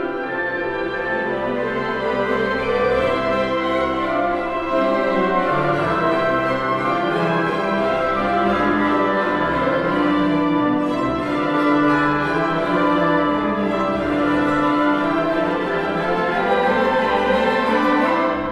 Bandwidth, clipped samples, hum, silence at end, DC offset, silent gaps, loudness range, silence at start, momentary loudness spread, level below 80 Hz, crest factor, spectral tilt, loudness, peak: 11.5 kHz; under 0.1%; none; 0 s; under 0.1%; none; 2 LU; 0 s; 4 LU; -44 dBFS; 14 dB; -6.5 dB/octave; -19 LUFS; -6 dBFS